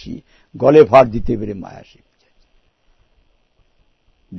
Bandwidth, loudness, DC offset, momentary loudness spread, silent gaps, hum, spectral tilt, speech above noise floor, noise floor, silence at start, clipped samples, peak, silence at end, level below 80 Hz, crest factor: 6.2 kHz; -13 LUFS; under 0.1%; 25 LU; none; none; -8 dB/octave; 44 dB; -59 dBFS; 0.05 s; 0.2%; 0 dBFS; 0 s; -38 dBFS; 18 dB